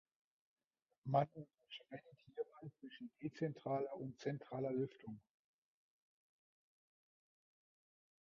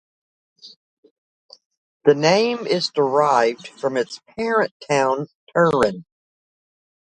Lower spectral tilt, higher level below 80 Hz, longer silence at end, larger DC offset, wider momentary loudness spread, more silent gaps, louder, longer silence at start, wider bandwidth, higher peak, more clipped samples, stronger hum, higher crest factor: first, -6.5 dB/octave vs -5 dB/octave; second, -86 dBFS vs -60 dBFS; first, 3.1 s vs 1.1 s; neither; first, 18 LU vs 10 LU; second, none vs 0.76-1.03 s, 1.11-1.49 s, 1.66-1.70 s, 1.77-2.00 s, 4.71-4.80 s, 5.35-5.47 s; second, -44 LUFS vs -20 LUFS; first, 1.05 s vs 0.65 s; second, 6.2 kHz vs 11 kHz; second, -22 dBFS vs -2 dBFS; neither; neither; first, 26 dB vs 20 dB